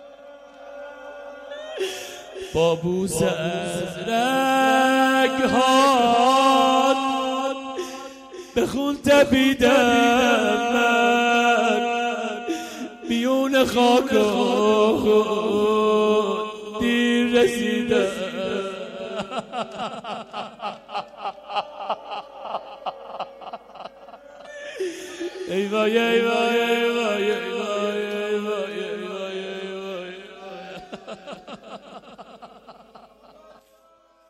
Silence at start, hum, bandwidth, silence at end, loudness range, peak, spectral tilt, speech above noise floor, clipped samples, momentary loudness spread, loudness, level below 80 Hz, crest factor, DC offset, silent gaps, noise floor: 0 s; none; 15.5 kHz; 1.6 s; 15 LU; -6 dBFS; -4 dB/octave; 38 dB; under 0.1%; 21 LU; -21 LUFS; -56 dBFS; 16 dB; under 0.1%; none; -57 dBFS